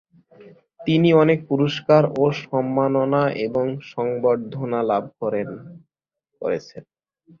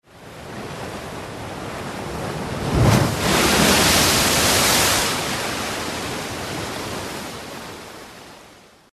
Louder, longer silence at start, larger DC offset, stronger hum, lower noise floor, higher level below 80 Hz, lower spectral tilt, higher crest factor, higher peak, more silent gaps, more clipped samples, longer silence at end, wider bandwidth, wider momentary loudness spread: about the same, -21 LUFS vs -19 LUFS; first, 0.4 s vs 0.15 s; neither; neither; first, -79 dBFS vs -48 dBFS; second, -62 dBFS vs -38 dBFS; first, -8 dB/octave vs -3 dB/octave; about the same, 18 dB vs 18 dB; about the same, -4 dBFS vs -2 dBFS; neither; neither; first, 0.6 s vs 0.4 s; second, 7 kHz vs 14 kHz; second, 12 LU vs 19 LU